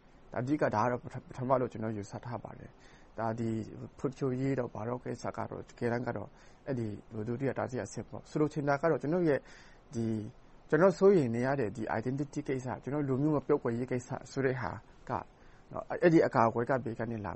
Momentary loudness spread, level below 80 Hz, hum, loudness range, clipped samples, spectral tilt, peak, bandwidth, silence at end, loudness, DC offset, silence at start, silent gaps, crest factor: 15 LU; -60 dBFS; none; 7 LU; under 0.1%; -7.5 dB/octave; -12 dBFS; 8.4 kHz; 0 s; -33 LUFS; under 0.1%; 0.3 s; none; 22 dB